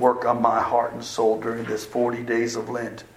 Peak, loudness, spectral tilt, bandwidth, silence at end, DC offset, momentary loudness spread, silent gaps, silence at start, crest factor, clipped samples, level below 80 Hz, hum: -4 dBFS; -24 LUFS; -5 dB/octave; 16 kHz; 0.1 s; under 0.1%; 8 LU; none; 0 s; 20 dB; under 0.1%; -60 dBFS; none